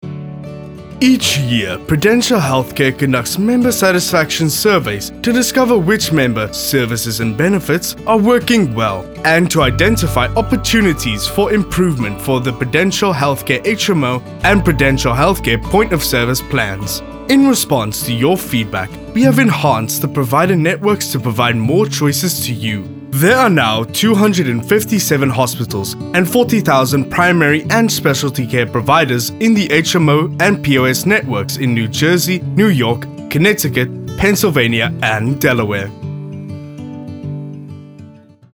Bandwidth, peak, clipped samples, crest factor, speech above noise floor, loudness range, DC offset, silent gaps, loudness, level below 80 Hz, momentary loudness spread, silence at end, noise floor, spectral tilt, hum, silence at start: over 20 kHz; 0 dBFS; under 0.1%; 14 dB; 26 dB; 2 LU; under 0.1%; none; -14 LUFS; -36 dBFS; 9 LU; 0.45 s; -39 dBFS; -4.5 dB/octave; none; 0.05 s